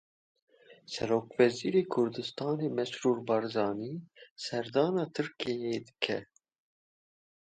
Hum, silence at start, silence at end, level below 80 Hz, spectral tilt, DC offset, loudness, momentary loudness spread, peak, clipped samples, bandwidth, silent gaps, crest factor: none; 0.7 s; 1.35 s; -72 dBFS; -5.5 dB/octave; under 0.1%; -32 LUFS; 10 LU; -10 dBFS; under 0.1%; 9.2 kHz; 4.31-4.36 s; 22 dB